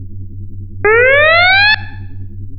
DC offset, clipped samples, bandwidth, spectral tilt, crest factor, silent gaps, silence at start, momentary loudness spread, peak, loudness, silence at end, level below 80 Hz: under 0.1%; under 0.1%; 5.6 kHz; -7 dB/octave; 12 dB; none; 0 s; 23 LU; 0 dBFS; -8 LUFS; 0 s; -30 dBFS